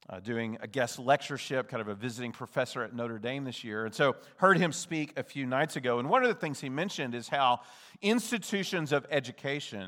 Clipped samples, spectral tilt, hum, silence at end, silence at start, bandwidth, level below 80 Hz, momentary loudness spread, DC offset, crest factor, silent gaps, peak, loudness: under 0.1%; -4.5 dB/octave; none; 0 s; 0.1 s; 19.5 kHz; -82 dBFS; 10 LU; under 0.1%; 22 dB; none; -8 dBFS; -31 LUFS